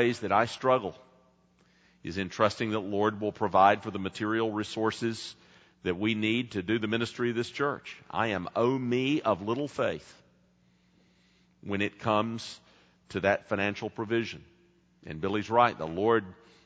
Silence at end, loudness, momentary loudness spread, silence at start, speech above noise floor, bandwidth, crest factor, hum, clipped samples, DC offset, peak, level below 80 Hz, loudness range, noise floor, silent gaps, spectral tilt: 0.35 s; -29 LUFS; 13 LU; 0 s; 37 dB; 9.4 kHz; 22 dB; none; under 0.1%; under 0.1%; -8 dBFS; -66 dBFS; 5 LU; -66 dBFS; none; -6 dB/octave